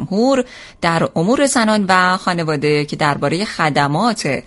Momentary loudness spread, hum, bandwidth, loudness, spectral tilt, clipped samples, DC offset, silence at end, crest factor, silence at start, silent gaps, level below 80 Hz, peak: 5 LU; none; 11.5 kHz; -16 LUFS; -4.5 dB/octave; under 0.1%; under 0.1%; 0.05 s; 16 dB; 0 s; none; -50 dBFS; 0 dBFS